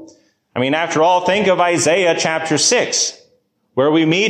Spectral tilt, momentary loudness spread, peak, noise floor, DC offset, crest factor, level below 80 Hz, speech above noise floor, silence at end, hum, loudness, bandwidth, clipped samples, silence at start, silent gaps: -3 dB/octave; 7 LU; -2 dBFS; -60 dBFS; under 0.1%; 14 dB; -60 dBFS; 46 dB; 0 s; none; -15 LUFS; 14 kHz; under 0.1%; 0 s; none